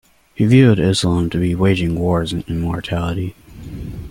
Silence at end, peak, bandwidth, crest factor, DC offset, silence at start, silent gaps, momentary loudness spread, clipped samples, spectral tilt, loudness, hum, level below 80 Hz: 0 s; -2 dBFS; 16 kHz; 16 dB; under 0.1%; 0.4 s; none; 19 LU; under 0.1%; -6.5 dB/octave; -17 LUFS; none; -38 dBFS